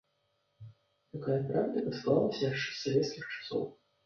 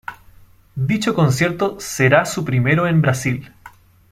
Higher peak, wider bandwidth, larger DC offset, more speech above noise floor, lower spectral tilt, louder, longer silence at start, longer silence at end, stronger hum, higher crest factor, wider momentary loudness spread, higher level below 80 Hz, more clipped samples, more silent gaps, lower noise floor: second, -14 dBFS vs -2 dBFS; second, 7 kHz vs 15.5 kHz; neither; first, 45 dB vs 30 dB; about the same, -6 dB/octave vs -6 dB/octave; second, -33 LUFS vs -18 LUFS; first, 0.6 s vs 0.1 s; about the same, 0.35 s vs 0.45 s; neither; about the same, 20 dB vs 16 dB; about the same, 11 LU vs 10 LU; second, -70 dBFS vs -48 dBFS; neither; neither; first, -77 dBFS vs -47 dBFS